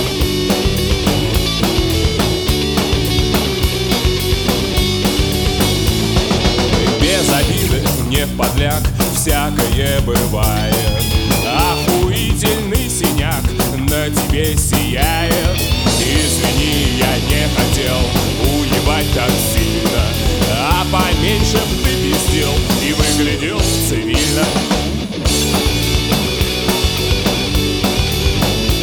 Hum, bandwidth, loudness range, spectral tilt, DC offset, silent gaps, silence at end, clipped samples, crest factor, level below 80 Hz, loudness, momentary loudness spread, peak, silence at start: none; over 20 kHz; 1 LU; -4 dB/octave; under 0.1%; none; 0 s; under 0.1%; 14 dB; -22 dBFS; -15 LUFS; 2 LU; -2 dBFS; 0 s